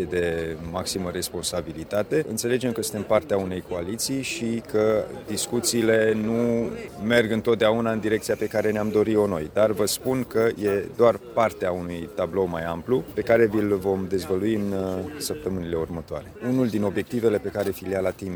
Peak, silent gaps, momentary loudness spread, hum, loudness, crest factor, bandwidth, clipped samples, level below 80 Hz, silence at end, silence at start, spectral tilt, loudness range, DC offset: -4 dBFS; none; 9 LU; none; -24 LUFS; 20 dB; over 20 kHz; under 0.1%; -52 dBFS; 0 s; 0 s; -5 dB/octave; 4 LU; under 0.1%